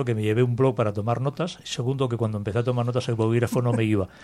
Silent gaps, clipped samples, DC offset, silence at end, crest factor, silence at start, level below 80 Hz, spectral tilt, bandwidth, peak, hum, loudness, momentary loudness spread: none; under 0.1%; under 0.1%; 0 s; 16 dB; 0 s; -56 dBFS; -7 dB/octave; 14 kHz; -8 dBFS; none; -24 LUFS; 6 LU